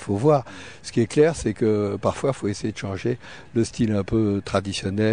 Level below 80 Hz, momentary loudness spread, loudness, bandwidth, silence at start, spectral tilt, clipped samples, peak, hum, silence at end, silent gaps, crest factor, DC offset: -48 dBFS; 9 LU; -23 LUFS; 10 kHz; 0 s; -6.5 dB/octave; under 0.1%; -6 dBFS; none; 0 s; none; 16 dB; 0.4%